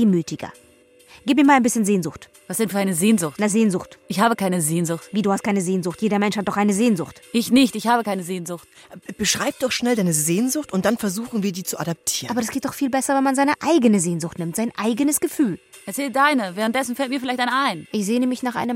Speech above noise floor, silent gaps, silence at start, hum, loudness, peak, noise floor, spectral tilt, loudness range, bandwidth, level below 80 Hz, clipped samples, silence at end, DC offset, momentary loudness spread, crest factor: 31 dB; none; 0 s; none; -21 LUFS; -4 dBFS; -51 dBFS; -4.5 dB/octave; 2 LU; 16.5 kHz; -60 dBFS; under 0.1%; 0 s; under 0.1%; 9 LU; 18 dB